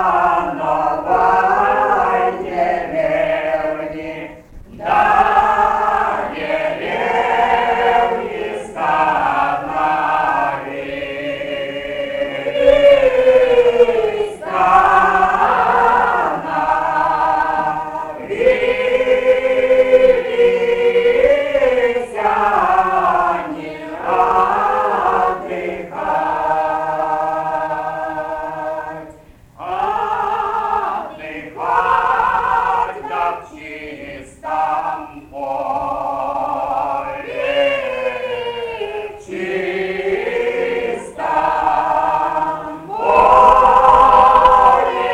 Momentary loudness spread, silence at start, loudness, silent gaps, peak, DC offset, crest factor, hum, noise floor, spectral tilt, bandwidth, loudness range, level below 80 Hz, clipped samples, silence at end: 14 LU; 0 s; -15 LUFS; none; -2 dBFS; under 0.1%; 14 dB; none; -42 dBFS; -5 dB/octave; 11.5 kHz; 8 LU; -42 dBFS; under 0.1%; 0 s